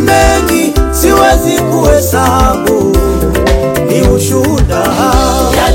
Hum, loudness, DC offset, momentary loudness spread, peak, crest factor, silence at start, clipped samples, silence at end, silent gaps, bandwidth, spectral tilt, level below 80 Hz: none; -9 LUFS; under 0.1%; 4 LU; 0 dBFS; 8 dB; 0 s; 1%; 0 s; none; 17 kHz; -5 dB/octave; -16 dBFS